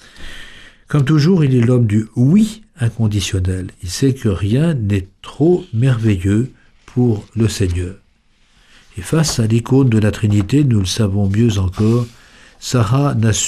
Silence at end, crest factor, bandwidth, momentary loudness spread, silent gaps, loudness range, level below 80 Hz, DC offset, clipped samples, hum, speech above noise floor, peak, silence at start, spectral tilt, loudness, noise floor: 0 s; 12 dB; 13.5 kHz; 12 LU; none; 3 LU; -38 dBFS; under 0.1%; under 0.1%; none; 40 dB; -2 dBFS; 0.2 s; -6.5 dB/octave; -16 LUFS; -54 dBFS